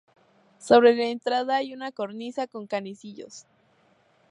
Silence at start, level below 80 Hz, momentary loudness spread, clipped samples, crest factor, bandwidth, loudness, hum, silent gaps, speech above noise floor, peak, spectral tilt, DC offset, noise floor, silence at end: 0.65 s; -72 dBFS; 24 LU; under 0.1%; 22 dB; 11 kHz; -24 LUFS; none; none; 39 dB; -4 dBFS; -4.5 dB/octave; under 0.1%; -63 dBFS; 0.9 s